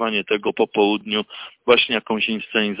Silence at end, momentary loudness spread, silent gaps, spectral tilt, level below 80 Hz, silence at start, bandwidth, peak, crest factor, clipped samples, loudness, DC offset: 0 s; 8 LU; none; -8.5 dB/octave; -60 dBFS; 0 s; 4 kHz; -4 dBFS; 16 dB; under 0.1%; -20 LUFS; under 0.1%